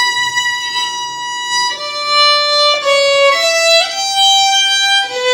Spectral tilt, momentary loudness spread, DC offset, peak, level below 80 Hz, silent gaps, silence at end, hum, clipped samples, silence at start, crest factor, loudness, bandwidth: 2 dB/octave; 8 LU; under 0.1%; 0 dBFS; -64 dBFS; none; 0 s; none; under 0.1%; 0 s; 12 dB; -11 LUFS; 19 kHz